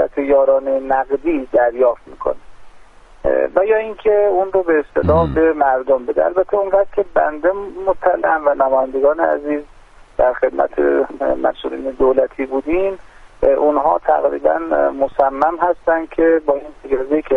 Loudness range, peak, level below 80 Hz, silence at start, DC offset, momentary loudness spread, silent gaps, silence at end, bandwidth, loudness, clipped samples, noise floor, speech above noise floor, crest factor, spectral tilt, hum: 3 LU; 0 dBFS; -40 dBFS; 0 s; under 0.1%; 8 LU; none; 0 s; 4.3 kHz; -16 LUFS; under 0.1%; -41 dBFS; 26 dB; 16 dB; -8.5 dB/octave; none